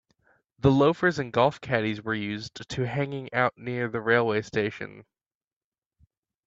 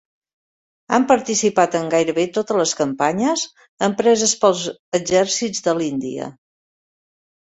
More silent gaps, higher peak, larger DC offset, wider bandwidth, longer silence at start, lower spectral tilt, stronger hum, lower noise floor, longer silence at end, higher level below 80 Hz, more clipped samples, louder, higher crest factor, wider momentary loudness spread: second, none vs 3.69-3.77 s, 4.79-4.92 s; second, -8 dBFS vs -2 dBFS; neither; about the same, 7.8 kHz vs 8.4 kHz; second, 0.65 s vs 0.9 s; first, -6.5 dB/octave vs -3.5 dB/octave; neither; about the same, under -90 dBFS vs under -90 dBFS; first, 1.45 s vs 1.15 s; about the same, -58 dBFS vs -60 dBFS; neither; second, -26 LUFS vs -19 LUFS; about the same, 20 dB vs 18 dB; first, 11 LU vs 8 LU